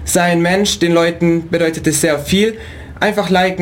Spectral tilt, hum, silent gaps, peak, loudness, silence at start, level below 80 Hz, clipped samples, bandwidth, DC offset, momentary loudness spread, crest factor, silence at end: -4.5 dB/octave; none; none; -2 dBFS; -14 LUFS; 0 s; -38 dBFS; under 0.1%; 17 kHz; under 0.1%; 5 LU; 12 dB; 0 s